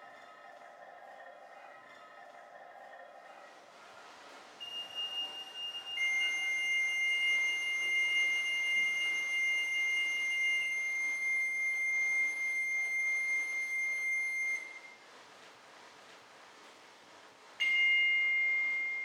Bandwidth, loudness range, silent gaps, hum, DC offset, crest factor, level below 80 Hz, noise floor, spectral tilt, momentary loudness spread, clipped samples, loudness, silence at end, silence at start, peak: 15.5 kHz; 23 LU; none; none; under 0.1%; 14 dB; under -90 dBFS; -57 dBFS; 2 dB/octave; 24 LU; under 0.1%; -31 LUFS; 0 s; 0 s; -22 dBFS